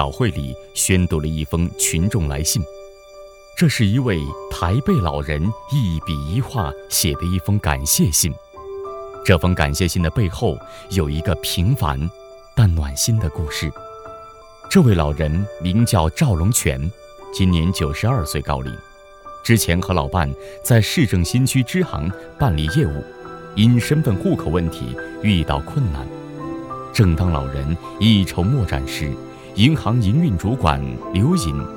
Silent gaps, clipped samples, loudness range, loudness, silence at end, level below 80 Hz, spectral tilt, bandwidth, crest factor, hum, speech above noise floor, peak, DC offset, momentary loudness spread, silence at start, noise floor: none; under 0.1%; 2 LU; -19 LUFS; 0 s; -32 dBFS; -5 dB/octave; 19.5 kHz; 18 dB; none; 23 dB; 0 dBFS; under 0.1%; 13 LU; 0 s; -41 dBFS